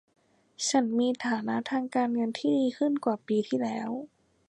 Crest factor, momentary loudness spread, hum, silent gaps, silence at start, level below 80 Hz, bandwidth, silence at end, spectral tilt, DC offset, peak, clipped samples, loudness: 16 dB; 7 LU; none; none; 0.6 s; -78 dBFS; 11.5 kHz; 0.45 s; -4 dB/octave; under 0.1%; -12 dBFS; under 0.1%; -29 LUFS